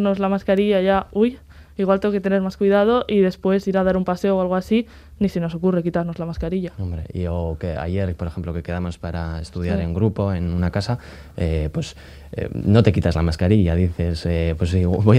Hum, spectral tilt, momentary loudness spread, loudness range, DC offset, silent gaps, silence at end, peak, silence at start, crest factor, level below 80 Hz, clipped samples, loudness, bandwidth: none; -8 dB/octave; 11 LU; 6 LU; under 0.1%; none; 0 s; 0 dBFS; 0 s; 20 dB; -38 dBFS; under 0.1%; -21 LUFS; 11.5 kHz